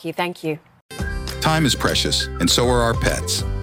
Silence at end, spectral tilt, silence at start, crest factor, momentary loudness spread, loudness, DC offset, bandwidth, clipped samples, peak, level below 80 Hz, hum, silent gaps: 0 s; -3.5 dB/octave; 0 s; 16 dB; 12 LU; -20 LUFS; under 0.1%; 17 kHz; under 0.1%; -4 dBFS; -30 dBFS; none; 0.81-0.89 s